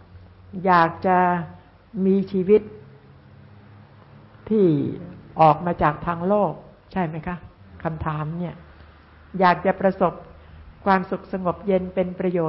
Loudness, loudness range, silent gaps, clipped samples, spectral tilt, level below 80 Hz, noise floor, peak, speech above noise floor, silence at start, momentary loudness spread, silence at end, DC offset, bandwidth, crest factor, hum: -22 LUFS; 4 LU; none; under 0.1%; -12 dB/octave; -48 dBFS; -48 dBFS; -4 dBFS; 27 dB; 0.15 s; 17 LU; 0 s; under 0.1%; 5.8 kHz; 18 dB; none